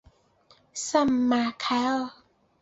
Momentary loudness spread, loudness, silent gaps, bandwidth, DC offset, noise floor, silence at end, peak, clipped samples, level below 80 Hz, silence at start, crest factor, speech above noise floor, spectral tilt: 13 LU; -25 LUFS; none; 8 kHz; under 0.1%; -61 dBFS; 0.5 s; -8 dBFS; under 0.1%; -62 dBFS; 0.75 s; 20 dB; 36 dB; -3 dB/octave